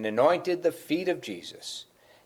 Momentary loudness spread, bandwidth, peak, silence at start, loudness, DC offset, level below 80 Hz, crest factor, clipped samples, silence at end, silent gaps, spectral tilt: 15 LU; 19 kHz; -10 dBFS; 0 s; -28 LUFS; under 0.1%; -76 dBFS; 18 dB; under 0.1%; 0.4 s; none; -4.5 dB/octave